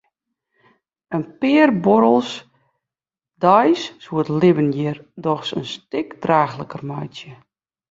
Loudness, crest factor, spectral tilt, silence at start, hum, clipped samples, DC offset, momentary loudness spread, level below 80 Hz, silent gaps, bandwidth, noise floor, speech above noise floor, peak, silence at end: -19 LUFS; 18 dB; -7 dB/octave; 1.1 s; none; under 0.1%; under 0.1%; 15 LU; -62 dBFS; none; 7.8 kHz; -88 dBFS; 70 dB; -2 dBFS; 0.6 s